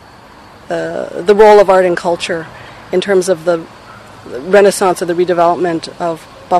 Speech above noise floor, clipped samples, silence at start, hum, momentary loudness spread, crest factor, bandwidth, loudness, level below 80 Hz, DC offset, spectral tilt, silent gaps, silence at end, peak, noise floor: 26 dB; 0.6%; 0.7 s; none; 18 LU; 12 dB; 13.5 kHz; -12 LUFS; -46 dBFS; under 0.1%; -4.5 dB/octave; none; 0 s; 0 dBFS; -38 dBFS